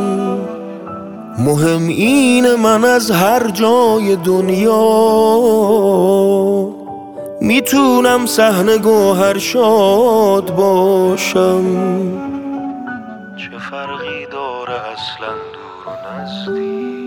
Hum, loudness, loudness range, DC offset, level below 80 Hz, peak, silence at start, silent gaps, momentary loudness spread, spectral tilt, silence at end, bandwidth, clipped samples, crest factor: none; -13 LUFS; 13 LU; under 0.1%; -54 dBFS; 0 dBFS; 0 s; none; 17 LU; -5 dB/octave; 0 s; 20 kHz; under 0.1%; 14 dB